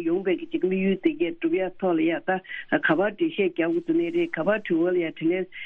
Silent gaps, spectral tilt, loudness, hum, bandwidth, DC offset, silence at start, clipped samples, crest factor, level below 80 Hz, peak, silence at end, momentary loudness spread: none; -9 dB/octave; -25 LUFS; none; 3.8 kHz; under 0.1%; 0 s; under 0.1%; 16 dB; -64 dBFS; -8 dBFS; 0 s; 4 LU